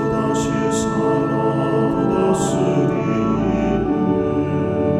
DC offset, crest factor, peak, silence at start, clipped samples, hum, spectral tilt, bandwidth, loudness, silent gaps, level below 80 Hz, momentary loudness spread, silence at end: under 0.1%; 12 dB; -6 dBFS; 0 s; under 0.1%; none; -7 dB/octave; 13.5 kHz; -19 LUFS; none; -40 dBFS; 2 LU; 0 s